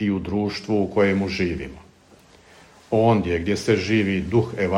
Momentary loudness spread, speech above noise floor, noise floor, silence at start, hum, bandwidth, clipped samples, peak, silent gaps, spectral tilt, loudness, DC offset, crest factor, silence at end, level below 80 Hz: 6 LU; 31 dB; -52 dBFS; 0 s; none; 12 kHz; under 0.1%; -6 dBFS; none; -6.5 dB/octave; -22 LUFS; under 0.1%; 16 dB; 0 s; -46 dBFS